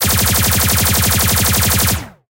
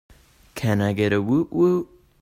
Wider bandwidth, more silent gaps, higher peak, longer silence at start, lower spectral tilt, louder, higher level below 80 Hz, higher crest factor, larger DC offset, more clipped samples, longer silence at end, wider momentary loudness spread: about the same, 17.5 kHz vs 16 kHz; neither; first, 0 dBFS vs -8 dBFS; second, 0 s vs 0.55 s; second, -3 dB/octave vs -7.5 dB/octave; first, -12 LUFS vs -22 LUFS; first, -26 dBFS vs -54 dBFS; about the same, 14 dB vs 16 dB; neither; neither; second, 0.2 s vs 0.35 s; second, 2 LU vs 13 LU